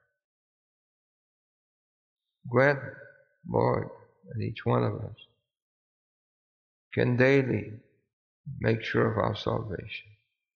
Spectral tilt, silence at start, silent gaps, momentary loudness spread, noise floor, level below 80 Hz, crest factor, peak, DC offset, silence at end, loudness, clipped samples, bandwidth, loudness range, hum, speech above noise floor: -6 dB/octave; 2.45 s; 5.62-6.91 s, 8.13-8.44 s; 20 LU; under -90 dBFS; -58 dBFS; 22 dB; -10 dBFS; under 0.1%; 0.55 s; -28 LUFS; under 0.1%; 6.8 kHz; 5 LU; none; over 63 dB